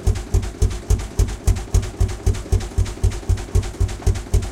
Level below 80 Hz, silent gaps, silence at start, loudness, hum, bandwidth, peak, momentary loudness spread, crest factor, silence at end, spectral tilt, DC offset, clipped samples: -22 dBFS; none; 0 s; -23 LUFS; none; 14 kHz; -4 dBFS; 3 LU; 14 dB; 0 s; -6 dB/octave; under 0.1%; under 0.1%